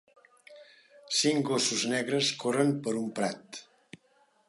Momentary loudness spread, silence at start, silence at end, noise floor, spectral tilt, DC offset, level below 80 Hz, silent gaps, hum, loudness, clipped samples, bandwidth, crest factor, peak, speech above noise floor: 10 LU; 0.5 s; 0.85 s; -67 dBFS; -3.5 dB/octave; under 0.1%; -82 dBFS; none; none; -28 LUFS; under 0.1%; 11.5 kHz; 20 dB; -12 dBFS; 38 dB